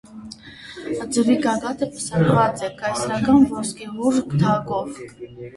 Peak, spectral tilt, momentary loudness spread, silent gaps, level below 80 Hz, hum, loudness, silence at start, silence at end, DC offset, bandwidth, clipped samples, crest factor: -4 dBFS; -6 dB/octave; 21 LU; none; -50 dBFS; none; -20 LUFS; 0.1 s; 0 s; under 0.1%; 11.5 kHz; under 0.1%; 18 dB